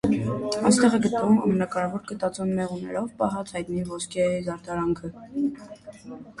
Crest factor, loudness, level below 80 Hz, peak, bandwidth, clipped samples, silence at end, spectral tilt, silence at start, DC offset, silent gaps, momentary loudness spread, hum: 20 dB; -25 LUFS; -56 dBFS; -6 dBFS; 11.5 kHz; under 0.1%; 0.1 s; -5.5 dB/octave; 0.05 s; under 0.1%; none; 14 LU; none